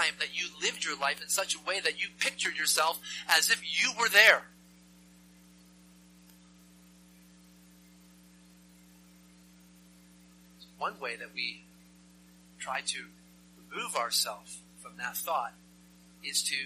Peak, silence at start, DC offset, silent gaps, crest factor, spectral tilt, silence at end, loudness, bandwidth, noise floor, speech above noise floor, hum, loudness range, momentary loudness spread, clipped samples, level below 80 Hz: -4 dBFS; 0 s; under 0.1%; none; 30 dB; 0.5 dB/octave; 0 s; -28 LUFS; 15 kHz; -58 dBFS; 27 dB; 60 Hz at -60 dBFS; 16 LU; 19 LU; under 0.1%; -72 dBFS